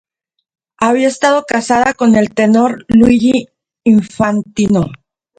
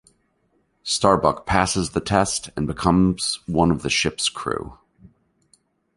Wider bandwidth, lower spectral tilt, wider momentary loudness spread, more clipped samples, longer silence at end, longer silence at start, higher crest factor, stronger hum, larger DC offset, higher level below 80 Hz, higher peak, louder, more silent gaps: second, 9.2 kHz vs 11.5 kHz; first, -6 dB/octave vs -4 dB/octave; second, 6 LU vs 10 LU; neither; second, 0.45 s vs 1.25 s; about the same, 0.8 s vs 0.85 s; second, 12 dB vs 22 dB; neither; neither; about the same, -42 dBFS vs -42 dBFS; about the same, 0 dBFS vs -2 dBFS; first, -12 LUFS vs -21 LUFS; neither